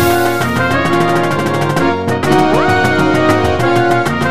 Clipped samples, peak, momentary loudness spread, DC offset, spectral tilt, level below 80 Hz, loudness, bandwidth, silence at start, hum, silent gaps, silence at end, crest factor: under 0.1%; 0 dBFS; 3 LU; 4%; -5.5 dB/octave; -38 dBFS; -12 LUFS; 15.5 kHz; 0 s; none; none; 0 s; 12 dB